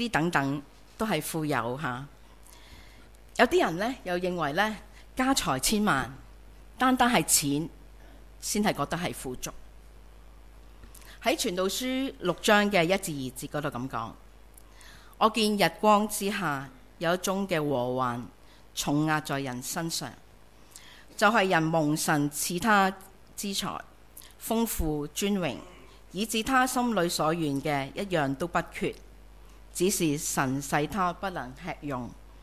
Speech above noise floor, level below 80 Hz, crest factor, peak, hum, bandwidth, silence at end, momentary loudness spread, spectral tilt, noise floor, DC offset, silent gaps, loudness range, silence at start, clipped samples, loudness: 27 dB; -50 dBFS; 24 dB; -6 dBFS; none; 16 kHz; 0 s; 15 LU; -4 dB/octave; -55 dBFS; 0.2%; none; 6 LU; 0 s; under 0.1%; -28 LUFS